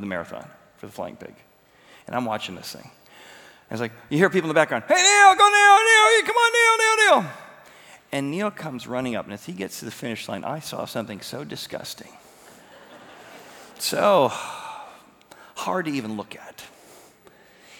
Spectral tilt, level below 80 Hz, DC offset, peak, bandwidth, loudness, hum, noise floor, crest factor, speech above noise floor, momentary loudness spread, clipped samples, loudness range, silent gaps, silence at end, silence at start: -2.5 dB/octave; -70 dBFS; under 0.1%; 0 dBFS; over 20 kHz; -19 LUFS; none; -53 dBFS; 22 dB; 32 dB; 24 LU; under 0.1%; 18 LU; none; 1.15 s; 0 s